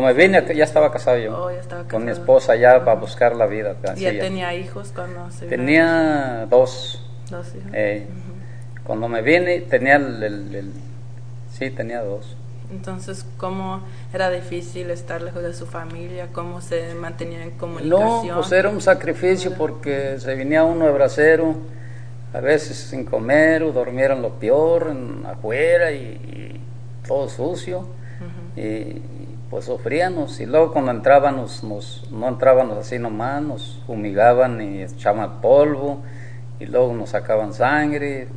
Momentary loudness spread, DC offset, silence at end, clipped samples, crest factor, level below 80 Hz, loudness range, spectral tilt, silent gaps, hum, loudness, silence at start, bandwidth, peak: 19 LU; 2%; 0 s; under 0.1%; 20 dB; -56 dBFS; 10 LU; -6.5 dB/octave; none; none; -19 LUFS; 0 s; 10 kHz; 0 dBFS